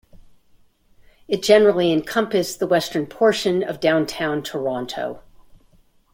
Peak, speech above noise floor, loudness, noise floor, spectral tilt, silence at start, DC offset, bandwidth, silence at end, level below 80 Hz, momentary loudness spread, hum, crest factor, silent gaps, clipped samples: -2 dBFS; 36 dB; -20 LUFS; -56 dBFS; -4.5 dB/octave; 0.15 s; under 0.1%; 16.5 kHz; 0.95 s; -56 dBFS; 12 LU; none; 20 dB; none; under 0.1%